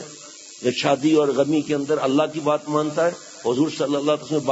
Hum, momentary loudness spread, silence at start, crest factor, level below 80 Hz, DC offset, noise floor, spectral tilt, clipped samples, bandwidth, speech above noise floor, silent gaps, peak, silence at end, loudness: none; 8 LU; 0 s; 16 dB; -68 dBFS; under 0.1%; -41 dBFS; -5 dB/octave; under 0.1%; 8 kHz; 21 dB; none; -4 dBFS; 0 s; -21 LUFS